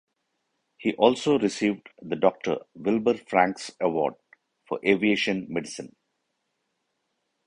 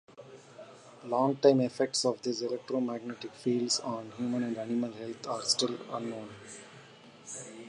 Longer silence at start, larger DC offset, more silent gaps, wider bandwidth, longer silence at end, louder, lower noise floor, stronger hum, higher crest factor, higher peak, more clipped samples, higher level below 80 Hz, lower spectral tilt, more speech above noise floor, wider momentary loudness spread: first, 0.8 s vs 0.1 s; neither; neither; about the same, 11 kHz vs 11 kHz; first, 1.6 s vs 0 s; first, -25 LUFS vs -31 LUFS; first, -78 dBFS vs -54 dBFS; neither; about the same, 22 dB vs 24 dB; first, -4 dBFS vs -10 dBFS; neither; first, -66 dBFS vs -80 dBFS; about the same, -5 dB/octave vs -4 dB/octave; first, 53 dB vs 22 dB; second, 13 LU vs 24 LU